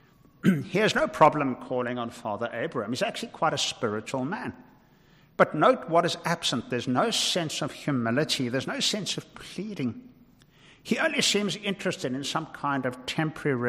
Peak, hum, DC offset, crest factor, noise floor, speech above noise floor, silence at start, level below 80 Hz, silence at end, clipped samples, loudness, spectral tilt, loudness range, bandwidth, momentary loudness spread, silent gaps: -6 dBFS; none; under 0.1%; 22 dB; -58 dBFS; 31 dB; 0.45 s; -64 dBFS; 0 s; under 0.1%; -27 LUFS; -4 dB/octave; 4 LU; 15.5 kHz; 11 LU; none